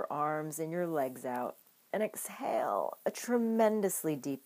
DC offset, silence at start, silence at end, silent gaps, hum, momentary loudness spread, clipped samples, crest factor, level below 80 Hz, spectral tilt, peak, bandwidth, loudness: under 0.1%; 0 s; 0.05 s; none; none; 9 LU; under 0.1%; 18 dB; under -90 dBFS; -5 dB/octave; -16 dBFS; 15.5 kHz; -34 LUFS